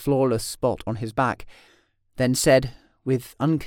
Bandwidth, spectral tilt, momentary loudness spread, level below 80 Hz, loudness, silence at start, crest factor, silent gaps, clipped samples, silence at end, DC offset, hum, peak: 18 kHz; -5.5 dB/octave; 16 LU; -46 dBFS; -23 LUFS; 0 s; 18 dB; none; under 0.1%; 0 s; under 0.1%; none; -6 dBFS